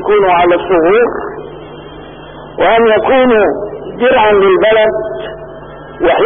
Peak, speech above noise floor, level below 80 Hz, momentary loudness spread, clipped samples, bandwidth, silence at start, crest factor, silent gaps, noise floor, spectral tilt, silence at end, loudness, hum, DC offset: -2 dBFS; 21 dB; -38 dBFS; 22 LU; under 0.1%; 3.7 kHz; 0 s; 10 dB; none; -30 dBFS; -11 dB/octave; 0 s; -10 LUFS; none; under 0.1%